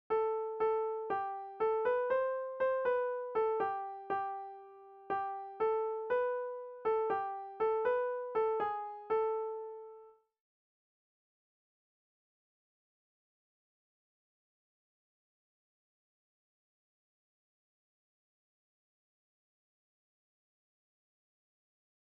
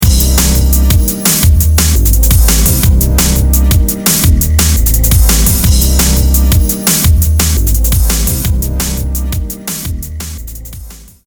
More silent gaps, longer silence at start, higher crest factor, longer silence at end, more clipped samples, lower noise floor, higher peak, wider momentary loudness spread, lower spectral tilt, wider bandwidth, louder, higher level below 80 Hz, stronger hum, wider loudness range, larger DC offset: neither; about the same, 0.1 s vs 0 s; first, 16 dB vs 10 dB; first, 11.95 s vs 0.25 s; second, under 0.1% vs 0.1%; first, -58 dBFS vs -30 dBFS; second, -22 dBFS vs 0 dBFS; about the same, 9 LU vs 10 LU; second, -2.5 dB/octave vs -4 dB/octave; second, 4.6 kHz vs over 20 kHz; second, -35 LUFS vs -10 LUFS; second, -78 dBFS vs -12 dBFS; neither; about the same, 7 LU vs 5 LU; neither